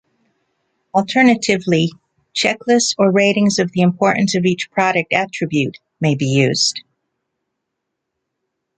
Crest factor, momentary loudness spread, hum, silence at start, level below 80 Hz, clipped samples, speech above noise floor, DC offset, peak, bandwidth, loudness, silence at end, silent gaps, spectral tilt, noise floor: 16 dB; 7 LU; none; 0.95 s; -58 dBFS; under 0.1%; 62 dB; under 0.1%; 0 dBFS; 9.4 kHz; -16 LUFS; 2 s; none; -4.5 dB/octave; -77 dBFS